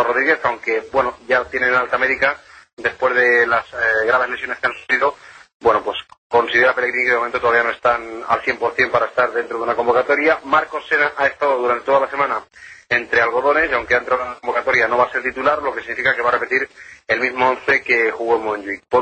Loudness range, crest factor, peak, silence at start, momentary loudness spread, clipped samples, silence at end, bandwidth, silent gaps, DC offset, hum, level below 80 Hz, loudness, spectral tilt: 1 LU; 14 dB; -4 dBFS; 0 s; 6 LU; under 0.1%; 0 s; 8.8 kHz; 2.73-2.77 s, 5.54-5.60 s, 6.18-6.30 s; under 0.1%; none; -54 dBFS; -17 LUFS; -4.5 dB/octave